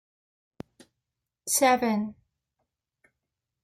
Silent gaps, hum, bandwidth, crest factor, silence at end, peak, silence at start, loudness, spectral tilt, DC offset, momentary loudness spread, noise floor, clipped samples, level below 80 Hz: none; none; 16.5 kHz; 22 dB; 1.5 s; -10 dBFS; 1.45 s; -25 LUFS; -3 dB/octave; under 0.1%; 26 LU; -86 dBFS; under 0.1%; -70 dBFS